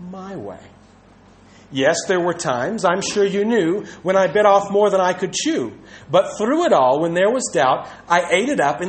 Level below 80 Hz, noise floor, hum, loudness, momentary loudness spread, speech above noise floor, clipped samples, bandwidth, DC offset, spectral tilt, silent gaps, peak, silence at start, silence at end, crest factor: -58 dBFS; -48 dBFS; none; -18 LUFS; 10 LU; 30 dB; under 0.1%; 8.8 kHz; under 0.1%; -4 dB/octave; none; -2 dBFS; 0 s; 0 s; 18 dB